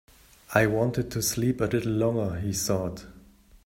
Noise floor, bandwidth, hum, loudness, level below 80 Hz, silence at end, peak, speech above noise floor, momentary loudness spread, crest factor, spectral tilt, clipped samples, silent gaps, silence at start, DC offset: -53 dBFS; 16 kHz; none; -27 LUFS; -50 dBFS; 0.45 s; -6 dBFS; 27 dB; 5 LU; 22 dB; -5 dB/octave; under 0.1%; none; 0.5 s; under 0.1%